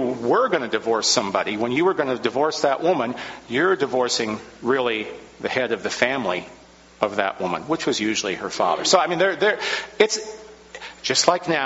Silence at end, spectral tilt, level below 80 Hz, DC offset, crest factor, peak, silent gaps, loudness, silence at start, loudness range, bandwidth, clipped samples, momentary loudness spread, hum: 0 s; -2 dB/octave; -62 dBFS; under 0.1%; 22 dB; 0 dBFS; none; -21 LUFS; 0 s; 3 LU; 8 kHz; under 0.1%; 10 LU; none